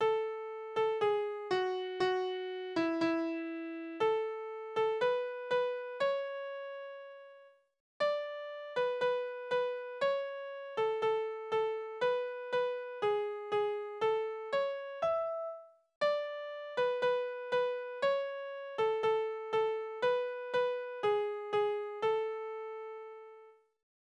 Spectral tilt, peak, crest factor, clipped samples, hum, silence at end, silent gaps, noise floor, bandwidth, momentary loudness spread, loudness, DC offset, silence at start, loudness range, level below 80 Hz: -5 dB/octave; -20 dBFS; 14 dB; under 0.1%; none; 0.5 s; 7.80-8.00 s, 15.96-16.01 s; -60 dBFS; 8.8 kHz; 10 LU; -35 LUFS; under 0.1%; 0 s; 3 LU; -80 dBFS